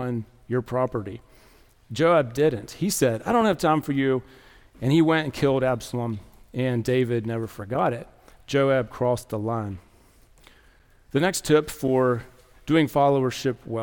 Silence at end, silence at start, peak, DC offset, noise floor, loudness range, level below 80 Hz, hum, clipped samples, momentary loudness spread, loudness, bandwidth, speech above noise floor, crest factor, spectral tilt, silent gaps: 0 s; 0 s; -8 dBFS; under 0.1%; -56 dBFS; 4 LU; -52 dBFS; none; under 0.1%; 11 LU; -24 LUFS; 18 kHz; 33 dB; 18 dB; -6 dB/octave; none